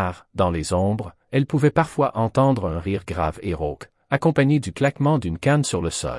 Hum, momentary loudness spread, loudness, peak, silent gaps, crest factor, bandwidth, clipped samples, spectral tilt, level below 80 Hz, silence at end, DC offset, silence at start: none; 8 LU; -22 LUFS; -4 dBFS; none; 18 dB; 12 kHz; under 0.1%; -6.5 dB/octave; -44 dBFS; 0 s; under 0.1%; 0 s